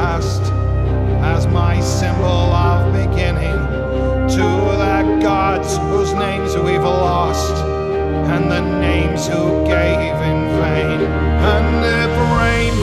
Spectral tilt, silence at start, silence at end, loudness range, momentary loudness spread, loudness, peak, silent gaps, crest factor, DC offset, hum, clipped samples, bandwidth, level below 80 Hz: -6.5 dB/octave; 0 s; 0 s; 1 LU; 4 LU; -16 LUFS; -2 dBFS; none; 14 dB; under 0.1%; none; under 0.1%; 13 kHz; -22 dBFS